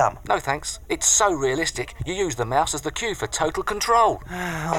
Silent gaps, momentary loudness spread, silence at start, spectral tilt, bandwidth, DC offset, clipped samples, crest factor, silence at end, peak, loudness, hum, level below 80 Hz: none; 10 LU; 0 s; -2.5 dB/octave; 17 kHz; under 0.1%; under 0.1%; 16 dB; 0 s; -6 dBFS; -22 LUFS; none; -42 dBFS